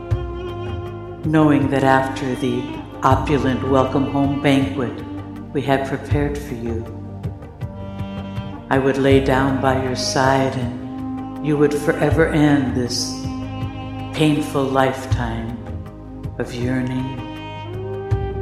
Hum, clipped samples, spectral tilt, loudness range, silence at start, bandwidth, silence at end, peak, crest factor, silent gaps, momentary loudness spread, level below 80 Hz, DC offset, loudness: none; under 0.1%; -6 dB/octave; 6 LU; 0 s; 14 kHz; 0 s; 0 dBFS; 20 dB; none; 15 LU; -36 dBFS; under 0.1%; -20 LUFS